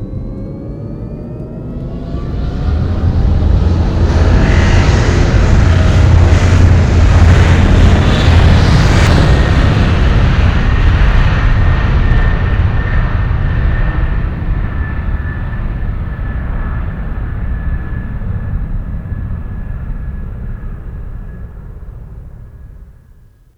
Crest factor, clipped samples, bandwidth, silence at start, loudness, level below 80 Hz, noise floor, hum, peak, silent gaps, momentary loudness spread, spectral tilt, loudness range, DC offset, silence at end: 12 dB; 0.4%; 8.6 kHz; 0 s; -13 LUFS; -14 dBFS; -42 dBFS; none; 0 dBFS; none; 16 LU; -7 dB/octave; 15 LU; under 0.1%; 0.65 s